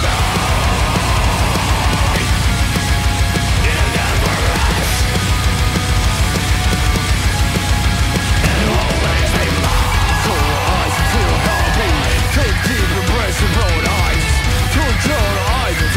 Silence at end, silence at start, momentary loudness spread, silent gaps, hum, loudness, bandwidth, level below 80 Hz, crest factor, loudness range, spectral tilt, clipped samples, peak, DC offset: 0 s; 0 s; 1 LU; none; none; -15 LUFS; 16 kHz; -18 dBFS; 14 dB; 1 LU; -4 dB/octave; under 0.1%; 0 dBFS; under 0.1%